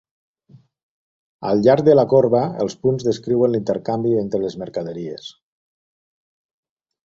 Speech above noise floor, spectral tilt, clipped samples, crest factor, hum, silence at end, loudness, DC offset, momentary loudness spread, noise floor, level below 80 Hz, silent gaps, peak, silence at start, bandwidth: 34 dB; -7.5 dB/octave; under 0.1%; 20 dB; none; 1.75 s; -18 LUFS; under 0.1%; 16 LU; -51 dBFS; -58 dBFS; none; -2 dBFS; 1.4 s; 7.8 kHz